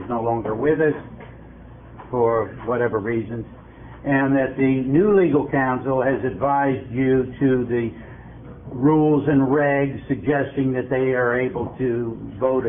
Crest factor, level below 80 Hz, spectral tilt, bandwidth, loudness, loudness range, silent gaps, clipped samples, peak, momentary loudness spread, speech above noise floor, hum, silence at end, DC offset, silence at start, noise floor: 14 dB; -48 dBFS; -12.5 dB/octave; 3.7 kHz; -21 LUFS; 4 LU; none; under 0.1%; -6 dBFS; 15 LU; 21 dB; none; 0 s; under 0.1%; 0 s; -41 dBFS